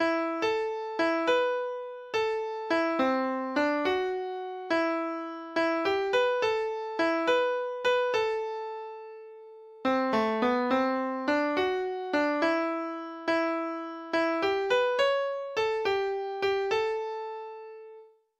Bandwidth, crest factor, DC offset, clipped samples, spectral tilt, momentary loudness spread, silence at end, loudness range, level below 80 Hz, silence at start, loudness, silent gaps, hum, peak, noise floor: 11.5 kHz; 14 dB; under 0.1%; under 0.1%; -4 dB/octave; 11 LU; 0.35 s; 2 LU; -68 dBFS; 0 s; -29 LUFS; none; none; -14 dBFS; -52 dBFS